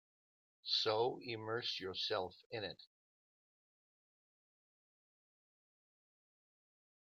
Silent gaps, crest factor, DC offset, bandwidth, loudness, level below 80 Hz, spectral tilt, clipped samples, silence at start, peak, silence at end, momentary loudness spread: 2.46-2.50 s; 22 dB; under 0.1%; 7.6 kHz; -40 LUFS; -88 dBFS; -4 dB/octave; under 0.1%; 0.65 s; -24 dBFS; 4.2 s; 12 LU